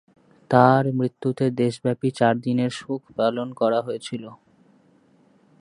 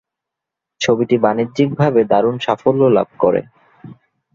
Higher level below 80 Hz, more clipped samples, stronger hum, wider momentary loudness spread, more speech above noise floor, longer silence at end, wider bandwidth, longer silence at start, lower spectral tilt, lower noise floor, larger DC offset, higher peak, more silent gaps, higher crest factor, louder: second, -66 dBFS vs -56 dBFS; neither; neither; first, 14 LU vs 4 LU; second, 36 dB vs 68 dB; first, 1.25 s vs 0.4 s; first, 11 kHz vs 7.6 kHz; second, 0.5 s vs 0.8 s; about the same, -7 dB/octave vs -6.5 dB/octave; second, -58 dBFS vs -83 dBFS; neither; about the same, 0 dBFS vs -2 dBFS; neither; first, 22 dB vs 16 dB; second, -22 LUFS vs -16 LUFS